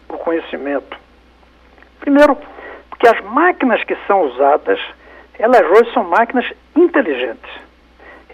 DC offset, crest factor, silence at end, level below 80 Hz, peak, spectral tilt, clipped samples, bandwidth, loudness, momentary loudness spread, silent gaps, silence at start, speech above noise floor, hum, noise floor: under 0.1%; 14 dB; 0.75 s; -50 dBFS; -2 dBFS; -5 dB/octave; under 0.1%; 13.5 kHz; -14 LUFS; 20 LU; none; 0.1 s; 34 dB; none; -47 dBFS